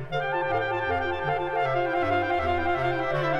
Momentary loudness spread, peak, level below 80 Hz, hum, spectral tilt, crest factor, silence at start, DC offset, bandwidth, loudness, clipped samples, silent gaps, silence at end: 2 LU; -12 dBFS; -48 dBFS; none; -7 dB/octave; 14 dB; 0 s; under 0.1%; 9 kHz; -26 LUFS; under 0.1%; none; 0 s